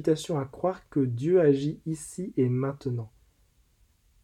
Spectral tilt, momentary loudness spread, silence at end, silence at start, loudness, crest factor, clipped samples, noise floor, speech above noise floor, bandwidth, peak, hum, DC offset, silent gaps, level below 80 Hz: -7.5 dB/octave; 13 LU; 1.15 s; 0 s; -28 LUFS; 18 dB; under 0.1%; -65 dBFS; 38 dB; 13 kHz; -10 dBFS; none; under 0.1%; none; -62 dBFS